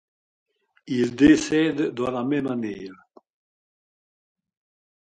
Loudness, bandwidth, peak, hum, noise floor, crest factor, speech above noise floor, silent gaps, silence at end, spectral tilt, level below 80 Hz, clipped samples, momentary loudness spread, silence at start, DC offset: -22 LUFS; 9.2 kHz; -4 dBFS; none; under -90 dBFS; 20 dB; over 68 dB; none; 2.1 s; -5.5 dB/octave; -54 dBFS; under 0.1%; 15 LU; 0.85 s; under 0.1%